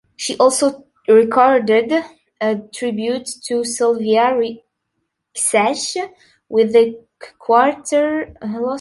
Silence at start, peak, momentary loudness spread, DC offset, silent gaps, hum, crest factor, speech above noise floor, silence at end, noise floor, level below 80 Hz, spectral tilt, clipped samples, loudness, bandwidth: 0.2 s; -2 dBFS; 12 LU; under 0.1%; none; none; 16 dB; 57 dB; 0 s; -74 dBFS; -60 dBFS; -3 dB/octave; under 0.1%; -17 LUFS; 11.5 kHz